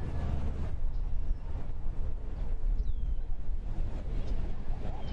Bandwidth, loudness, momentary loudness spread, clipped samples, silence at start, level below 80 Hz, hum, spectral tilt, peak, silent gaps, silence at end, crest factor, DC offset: 4.1 kHz; -39 LUFS; 5 LU; under 0.1%; 0 s; -32 dBFS; none; -8.5 dB/octave; -18 dBFS; none; 0 s; 10 dB; under 0.1%